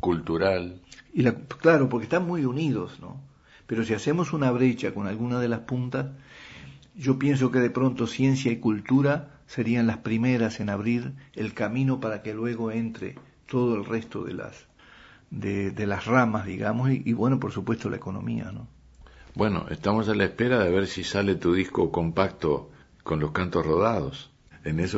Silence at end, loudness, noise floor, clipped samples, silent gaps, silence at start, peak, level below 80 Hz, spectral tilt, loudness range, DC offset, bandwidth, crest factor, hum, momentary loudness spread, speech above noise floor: 0 s; -26 LUFS; -52 dBFS; under 0.1%; none; 0 s; -4 dBFS; -52 dBFS; -7 dB/octave; 4 LU; under 0.1%; 8 kHz; 22 dB; none; 15 LU; 27 dB